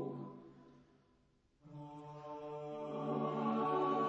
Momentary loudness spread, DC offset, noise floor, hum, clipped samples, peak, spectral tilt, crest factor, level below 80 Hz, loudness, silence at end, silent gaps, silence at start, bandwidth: 20 LU; under 0.1%; -74 dBFS; none; under 0.1%; -24 dBFS; -8.5 dB/octave; 16 dB; -80 dBFS; -40 LUFS; 0 s; none; 0 s; 7.8 kHz